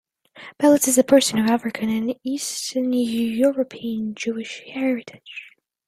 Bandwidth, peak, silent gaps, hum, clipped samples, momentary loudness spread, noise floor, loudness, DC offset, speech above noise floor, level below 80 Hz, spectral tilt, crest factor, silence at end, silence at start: 15.5 kHz; -2 dBFS; none; none; under 0.1%; 16 LU; -45 dBFS; -21 LUFS; under 0.1%; 24 dB; -64 dBFS; -3.5 dB/octave; 20 dB; 0.4 s; 0.35 s